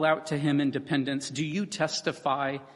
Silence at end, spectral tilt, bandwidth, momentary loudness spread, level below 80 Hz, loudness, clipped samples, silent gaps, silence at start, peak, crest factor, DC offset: 0.05 s; -5 dB/octave; 11.5 kHz; 5 LU; -70 dBFS; -29 LUFS; under 0.1%; none; 0 s; -10 dBFS; 18 dB; under 0.1%